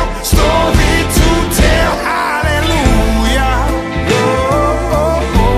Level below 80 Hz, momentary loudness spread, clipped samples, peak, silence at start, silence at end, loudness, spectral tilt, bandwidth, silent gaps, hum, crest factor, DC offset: -16 dBFS; 3 LU; under 0.1%; 0 dBFS; 0 s; 0 s; -12 LUFS; -5 dB/octave; 15.5 kHz; none; none; 12 dB; under 0.1%